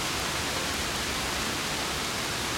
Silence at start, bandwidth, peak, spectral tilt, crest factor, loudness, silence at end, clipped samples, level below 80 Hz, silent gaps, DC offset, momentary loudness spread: 0 s; 16.5 kHz; -14 dBFS; -2 dB/octave; 16 dB; -28 LUFS; 0 s; under 0.1%; -46 dBFS; none; under 0.1%; 1 LU